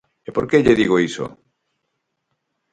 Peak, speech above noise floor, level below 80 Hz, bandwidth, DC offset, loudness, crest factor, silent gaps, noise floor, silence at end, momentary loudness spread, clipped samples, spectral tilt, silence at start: -2 dBFS; 58 dB; -48 dBFS; 9.4 kHz; under 0.1%; -17 LUFS; 20 dB; none; -75 dBFS; 1.45 s; 14 LU; under 0.1%; -6 dB/octave; 0.3 s